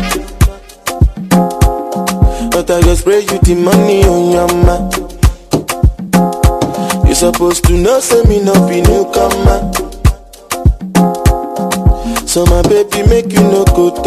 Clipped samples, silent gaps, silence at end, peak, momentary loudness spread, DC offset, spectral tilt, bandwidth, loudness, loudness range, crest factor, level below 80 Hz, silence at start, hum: 0.3%; none; 0 s; 0 dBFS; 7 LU; under 0.1%; -5.5 dB/octave; 15 kHz; -11 LUFS; 2 LU; 10 dB; -16 dBFS; 0 s; none